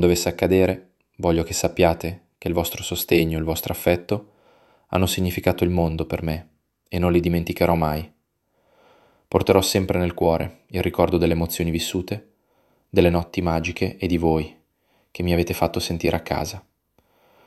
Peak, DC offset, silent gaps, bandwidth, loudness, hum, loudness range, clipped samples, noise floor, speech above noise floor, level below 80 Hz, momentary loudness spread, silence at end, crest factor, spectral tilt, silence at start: -2 dBFS; under 0.1%; none; 15 kHz; -22 LUFS; none; 3 LU; under 0.1%; -69 dBFS; 48 dB; -40 dBFS; 10 LU; 0.85 s; 22 dB; -5.5 dB/octave; 0 s